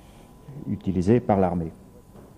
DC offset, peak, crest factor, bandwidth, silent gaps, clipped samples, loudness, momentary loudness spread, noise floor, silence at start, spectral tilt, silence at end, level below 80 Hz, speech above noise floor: under 0.1%; -6 dBFS; 20 dB; 11 kHz; none; under 0.1%; -24 LUFS; 17 LU; -48 dBFS; 0.5 s; -9 dB/octave; 0.1 s; -50 dBFS; 25 dB